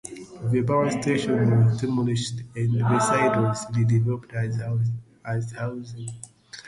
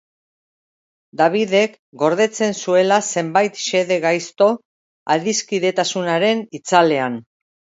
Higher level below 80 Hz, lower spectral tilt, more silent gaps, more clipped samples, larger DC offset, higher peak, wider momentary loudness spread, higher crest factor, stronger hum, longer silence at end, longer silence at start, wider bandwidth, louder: first, -56 dBFS vs -70 dBFS; first, -6.5 dB/octave vs -3.5 dB/octave; second, none vs 1.79-1.92 s, 4.65-5.06 s; neither; neither; second, -10 dBFS vs 0 dBFS; first, 15 LU vs 7 LU; about the same, 14 dB vs 18 dB; neither; second, 0 s vs 0.45 s; second, 0.05 s vs 1.15 s; first, 11.5 kHz vs 8 kHz; second, -24 LUFS vs -18 LUFS